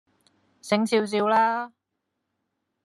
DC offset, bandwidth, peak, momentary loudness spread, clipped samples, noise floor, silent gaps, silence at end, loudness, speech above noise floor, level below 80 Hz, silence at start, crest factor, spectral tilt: under 0.1%; 12.5 kHz; -8 dBFS; 16 LU; under 0.1%; -80 dBFS; none; 1.15 s; -23 LUFS; 58 dB; -82 dBFS; 0.65 s; 18 dB; -5 dB/octave